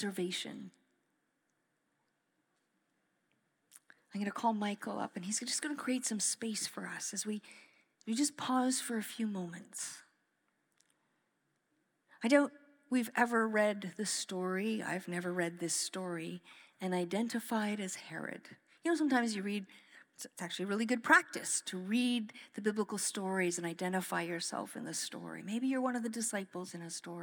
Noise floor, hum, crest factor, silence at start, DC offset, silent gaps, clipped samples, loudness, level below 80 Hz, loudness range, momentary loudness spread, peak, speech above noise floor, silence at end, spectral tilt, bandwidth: -81 dBFS; none; 26 dB; 0 s; under 0.1%; none; under 0.1%; -36 LUFS; under -90 dBFS; 7 LU; 12 LU; -12 dBFS; 45 dB; 0 s; -3.5 dB/octave; over 20 kHz